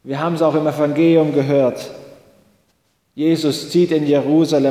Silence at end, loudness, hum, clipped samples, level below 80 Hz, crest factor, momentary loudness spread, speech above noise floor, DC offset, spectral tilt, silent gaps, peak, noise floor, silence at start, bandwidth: 0 s; -16 LUFS; none; under 0.1%; -62 dBFS; 14 dB; 7 LU; 48 dB; under 0.1%; -6.5 dB/octave; none; -2 dBFS; -63 dBFS; 0.05 s; 15.5 kHz